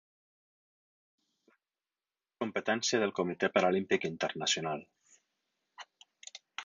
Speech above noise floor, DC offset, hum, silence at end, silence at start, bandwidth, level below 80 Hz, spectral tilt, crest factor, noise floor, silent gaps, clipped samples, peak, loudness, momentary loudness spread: over 58 dB; under 0.1%; none; 0 s; 2.4 s; 9 kHz; -76 dBFS; -3.5 dB/octave; 24 dB; under -90 dBFS; none; under 0.1%; -12 dBFS; -32 LUFS; 23 LU